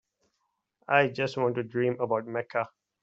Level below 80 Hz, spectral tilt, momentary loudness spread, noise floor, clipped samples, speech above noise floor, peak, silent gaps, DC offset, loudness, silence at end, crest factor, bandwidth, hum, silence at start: -74 dBFS; -4.5 dB/octave; 8 LU; -79 dBFS; under 0.1%; 51 dB; -6 dBFS; none; under 0.1%; -28 LUFS; 0.35 s; 22 dB; 7.8 kHz; none; 0.9 s